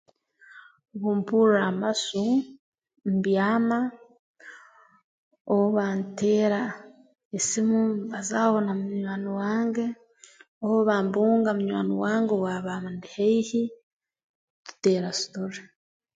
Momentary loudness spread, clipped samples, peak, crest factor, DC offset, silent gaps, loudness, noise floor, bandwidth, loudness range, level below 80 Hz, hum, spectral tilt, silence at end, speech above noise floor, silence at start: 11 LU; under 0.1%; -8 dBFS; 18 dB; under 0.1%; 2.59-2.72 s, 4.19-4.34 s, 5.04-5.31 s, 5.41-5.45 s, 7.25-7.31 s, 10.48-10.61 s, 13.83-14.00 s, 14.24-14.65 s; -25 LUFS; -55 dBFS; 9.4 kHz; 3 LU; -72 dBFS; none; -5 dB/octave; 0.55 s; 31 dB; 0.55 s